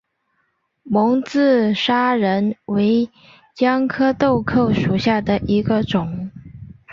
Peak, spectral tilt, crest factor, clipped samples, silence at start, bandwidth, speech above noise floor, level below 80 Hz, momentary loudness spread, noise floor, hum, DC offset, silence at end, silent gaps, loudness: -4 dBFS; -7 dB/octave; 14 dB; under 0.1%; 0.85 s; 7.4 kHz; 51 dB; -46 dBFS; 6 LU; -68 dBFS; none; under 0.1%; 0 s; none; -18 LUFS